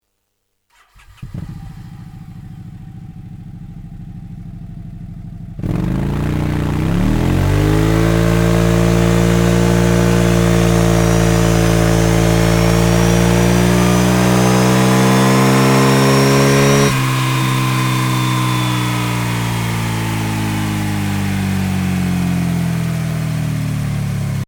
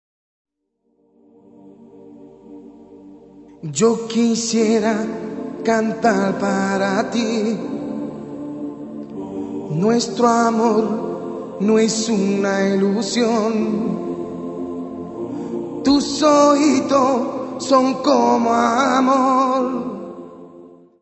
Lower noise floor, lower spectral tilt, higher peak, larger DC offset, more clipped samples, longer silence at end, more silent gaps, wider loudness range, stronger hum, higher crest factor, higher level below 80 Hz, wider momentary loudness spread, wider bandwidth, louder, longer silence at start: about the same, -69 dBFS vs -69 dBFS; about the same, -5.5 dB/octave vs -5 dB/octave; about the same, 0 dBFS vs -2 dBFS; neither; neither; second, 0.05 s vs 0.35 s; neither; first, 21 LU vs 7 LU; neither; about the same, 14 dB vs 18 dB; first, -26 dBFS vs -58 dBFS; first, 21 LU vs 14 LU; first, over 20 kHz vs 8.4 kHz; first, -14 LUFS vs -18 LUFS; second, 1.2 s vs 1.65 s